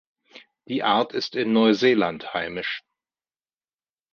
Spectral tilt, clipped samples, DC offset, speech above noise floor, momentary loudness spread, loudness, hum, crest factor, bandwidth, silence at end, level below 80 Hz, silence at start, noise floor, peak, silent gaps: -5.5 dB/octave; under 0.1%; under 0.1%; over 68 dB; 12 LU; -23 LUFS; none; 18 dB; 6.8 kHz; 1.35 s; -66 dBFS; 0.35 s; under -90 dBFS; -6 dBFS; none